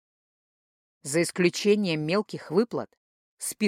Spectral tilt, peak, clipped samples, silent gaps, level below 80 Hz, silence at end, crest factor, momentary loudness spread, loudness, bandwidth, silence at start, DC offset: -4.5 dB/octave; -10 dBFS; under 0.1%; 2.97-3.37 s; -76 dBFS; 0 s; 18 dB; 12 LU; -26 LUFS; 16 kHz; 1.05 s; under 0.1%